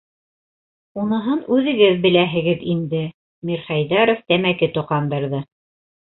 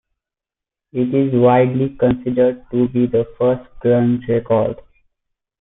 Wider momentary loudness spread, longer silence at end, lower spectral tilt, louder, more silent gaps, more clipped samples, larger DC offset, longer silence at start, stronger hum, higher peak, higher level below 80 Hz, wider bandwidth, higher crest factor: first, 12 LU vs 7 LU; second, 0.7 s vs 0.85 s; second, -11 dB/octave vs -13.5 dB/octave; about the same, -19 LUFS vs -17 LUFS; first, 3.14-3.42 s vs none; neither; neither; about the same, 0.95 s vs 0.95 s; neither; about the same, -2 dBFS vs -2 dBFS; second, -58 dBFS vs -48 dBFS; about the same, 4.2 kHz vs 3.9 kHz; about the same, 18 dB vs 14 dB